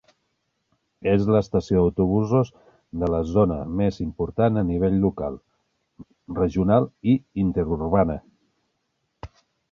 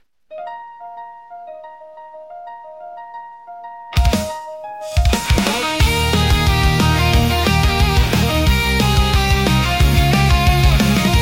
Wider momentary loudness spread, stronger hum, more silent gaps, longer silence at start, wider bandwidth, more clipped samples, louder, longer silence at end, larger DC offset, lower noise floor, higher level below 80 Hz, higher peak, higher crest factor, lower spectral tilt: second, 9 LU vs 21 LU; neither; neither; first, 1.05 s vs 0.3 s; second, 7 kHz vs 16.5 kHz; neither; second, -23 LUFS vs -15 LUFS; first, 0.45 s vs 0 s; second, under 0.1% vs 0.3%; first, -75 dBFS vs -37 dBFS; second, -40 dBFS vs -20 dBFS; about the same, -4 dBFS vs -2 dBFS; first, 20 dB vs 14 dB; first, -9.5 dB/octave vs -5 dB/octave